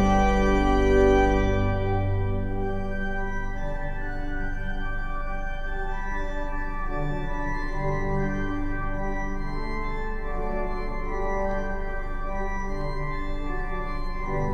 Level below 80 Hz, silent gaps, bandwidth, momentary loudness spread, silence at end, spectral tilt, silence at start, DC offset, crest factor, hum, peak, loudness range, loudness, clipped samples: -28 dBFS; none; 7.4 kHz; 12 LU; 0 s; -7 dB/octave; 0 s; under 0.1%; 18 dB; none; -8 dBFS; 8 LU; -28 LUFS; under 0.1%